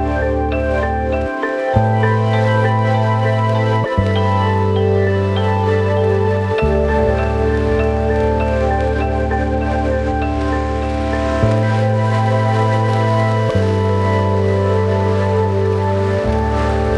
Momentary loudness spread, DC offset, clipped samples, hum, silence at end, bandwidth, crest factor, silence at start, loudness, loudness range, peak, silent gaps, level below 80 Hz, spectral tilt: 3 LU; under 0.1%; under 0.1%; none; 0 s; 9.2 kHz; 14 dB; 0 s; -16 LUFS; 2 LU; -2 dBFS; none; -26 dBFS; -8 dB/octave